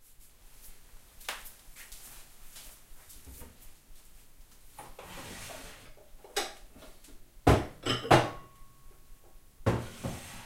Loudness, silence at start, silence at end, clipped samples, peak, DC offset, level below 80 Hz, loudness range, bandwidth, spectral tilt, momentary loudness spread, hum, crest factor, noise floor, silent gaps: -31 LUFS; 0.1 s; 0 s; under 0.1%; -8 dBFS; under 0.1%; -48 dBFS; 20 LU; 16 kHz; -5 dB/octave; 27 LU; none; 28 dB; -54 dBFS; none